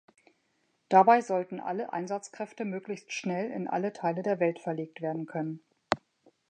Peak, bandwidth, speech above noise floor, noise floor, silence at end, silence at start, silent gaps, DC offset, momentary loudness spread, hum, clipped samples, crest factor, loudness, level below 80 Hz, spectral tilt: -8 dBFS; 9.4 kHz; 45 dB; -74 dBFS; 0.55 s; 0.9 s; none; under 0.1%; 14 LU; none; under 0.1%; 22 dB; -30 LUFS; -76 dBFS; -6 dB/octave